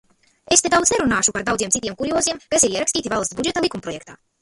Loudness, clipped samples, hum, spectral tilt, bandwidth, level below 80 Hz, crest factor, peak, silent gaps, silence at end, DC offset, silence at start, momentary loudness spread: -19 LUFS; under 0.1%; none; -2 dB/octave; 11.5 kHz; -48 dBFS; 20 dB; 0 dBFS; none; 0.25 s; under 0.1%; 0.5 s; 8 LU